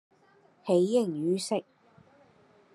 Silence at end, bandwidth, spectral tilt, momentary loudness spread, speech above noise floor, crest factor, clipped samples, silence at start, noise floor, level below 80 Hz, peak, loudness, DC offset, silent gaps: 1.15 s; 12.5 kHz; -6 dB/octave; 9 LU; 36 dB; 18 dB; under 0.1%; 0.65 s; -63 dBFS; -84 dBFS; -12 dBFS; -28 LUFS; under 0.1%; none